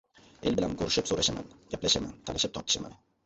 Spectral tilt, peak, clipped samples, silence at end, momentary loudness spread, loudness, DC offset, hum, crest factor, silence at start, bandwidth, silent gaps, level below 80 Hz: -3 dB/octave; -12 dBFS; under 0.1%; 0.3 s; 10 LU; -29 LUFS; under 0.1%; none; 20 dB; 0.4 s; 8.4 kHz; none; -52 dBFS